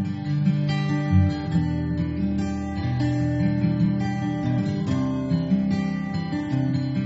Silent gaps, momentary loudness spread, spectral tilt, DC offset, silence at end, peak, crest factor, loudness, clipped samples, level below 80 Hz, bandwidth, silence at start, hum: none; 5 LU; -8 dB/octave; under 0.1%; 0 s; -8 dBFS; 16 dB; -24 LUFS; under 0.1%; -42 dBFS; 8 kHz; 0 s; none